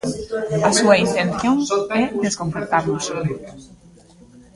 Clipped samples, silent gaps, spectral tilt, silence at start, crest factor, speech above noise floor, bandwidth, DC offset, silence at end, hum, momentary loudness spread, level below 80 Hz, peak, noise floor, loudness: under 0.1%; none; -4.5 dB/octave; 0.05 s; 20 dB; 28 dB; 11.5 kHz; under 0.1%; 0.9 s; none; 11 LU; -50 dBFS; 0 dBFS; -47 dBFS; -19 LUFS